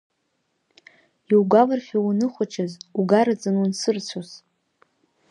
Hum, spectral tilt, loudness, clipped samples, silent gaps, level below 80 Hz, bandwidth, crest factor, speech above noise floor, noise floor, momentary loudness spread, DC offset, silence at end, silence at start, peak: none; -6 dB/octave; -21 LUFS; under 0.1%; none; -76 dBFS; 11.5 kHz; 20 dB; 52 dB; -73 dBFS; 12 LU; under 0.1%; 0.95 s; 1.3 s; -4 dBFS